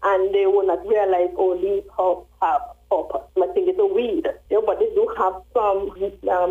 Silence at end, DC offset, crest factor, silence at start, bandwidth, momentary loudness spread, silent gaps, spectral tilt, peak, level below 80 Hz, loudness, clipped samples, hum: 0 s; under 0.1%; 12 dB; 0 s; 3.8 kHz; 6 LU; none; -6.5 dB/octave; -10 dBFS; -50 dBFS; -21 LUFS; under 0.1%; none